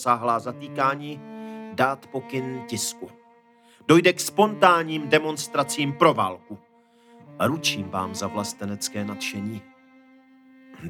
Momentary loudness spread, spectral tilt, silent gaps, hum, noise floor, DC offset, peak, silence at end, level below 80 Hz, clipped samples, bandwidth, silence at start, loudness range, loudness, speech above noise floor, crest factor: 19 LU; -4 dB/octave; none; none; -56 dBFS; under 0.1%; -2 dBFS; 0 s; -74 dBFS; under 0.1%; 19.5 kHz; 0 s; 8 LU; -24 LUFS; 32 dB; 22 dB